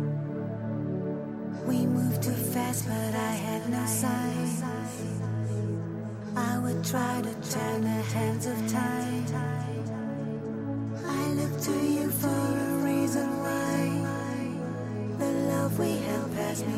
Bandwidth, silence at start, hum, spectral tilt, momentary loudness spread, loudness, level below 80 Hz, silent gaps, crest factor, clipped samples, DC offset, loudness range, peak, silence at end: 16 kHz; 0 s; none; -6 dB/octave; 7 LU; -30 LUFS; -62 dBFS; none; 14 dB; under 0.1%; under 0.1%; 3 LU; -14 dBFS; 0 s